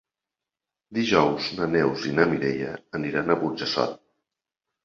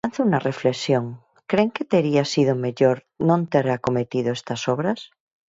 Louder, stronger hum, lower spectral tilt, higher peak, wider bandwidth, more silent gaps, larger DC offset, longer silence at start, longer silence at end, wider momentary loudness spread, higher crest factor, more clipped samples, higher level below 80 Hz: second, -25 LUFS vs -22 LUFS; neither; about the same, -5.5 dB/octave vs -6.5 dB/octave; about the same, -2 dBFS vs -4 dBFS; about the same, 7.4 kHz vs 8 kHz; neither; neither; first, 0.9 s vs 0.05 s; first, 0.9 s vs 0.45 s; first, 10 LU vs 6 LU; first, 24 dB vs 18 dB; neither; about the same, -58 dBFS vs -62 dBFS